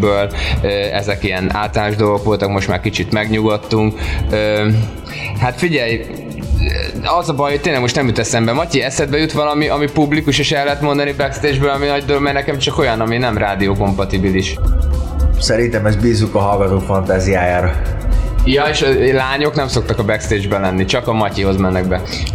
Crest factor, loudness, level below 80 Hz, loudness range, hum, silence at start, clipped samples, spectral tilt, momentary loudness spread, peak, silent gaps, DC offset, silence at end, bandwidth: 12 dB; -15 LUFS; -24 dBFS; 2 LU; none; 0 s; under 0.1%; -5.5 dB/octave; 4 LU; -2 dBFS; none; under 0.1%; 0 s; 15.5 kHz